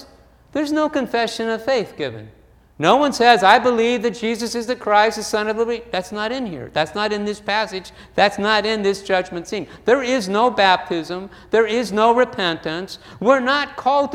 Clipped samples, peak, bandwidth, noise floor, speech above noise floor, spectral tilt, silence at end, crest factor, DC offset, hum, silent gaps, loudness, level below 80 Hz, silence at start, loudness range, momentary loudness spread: under 0.1%; 0 dBFS; 16 kHz; -49 dBFS; 30 dB; -4 dB/octave; 0 s; 20 dB; under 0.1%; none; none; -19 LUFS; -52 dBFS; 0 s; 4 LU; 12 LU